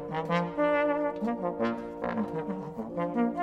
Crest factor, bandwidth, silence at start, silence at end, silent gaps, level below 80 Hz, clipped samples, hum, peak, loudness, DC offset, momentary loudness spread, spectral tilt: 16 dB; 8.4 kHz; 0 s; 0 s; none; -60 dBFS; under 0.1%; none; -14 dBFS; -30 LUFS; under 0.1%; 8 LU; -8 dB/octave